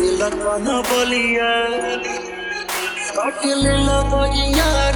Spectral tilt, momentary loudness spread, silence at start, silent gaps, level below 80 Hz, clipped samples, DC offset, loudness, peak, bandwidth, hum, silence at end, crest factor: -4 dB/octave; 7 LU; 0 s; none; -26 dBFS; under 0.1%; under 0.1%; -18 LUFS; -4 dBFS; over 20 kHz; none; 0 s; 14 dB